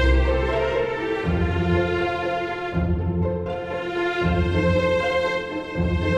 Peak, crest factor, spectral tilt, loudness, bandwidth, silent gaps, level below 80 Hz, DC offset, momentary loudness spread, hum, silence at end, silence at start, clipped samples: -8 dBFS; 14 dB; -7.5 dB/octave; -23 LUFS; 9 kHz; none; -30 dBFS; under 0.1%; 6 LU; none; 0 s; 0 s; under 0.1%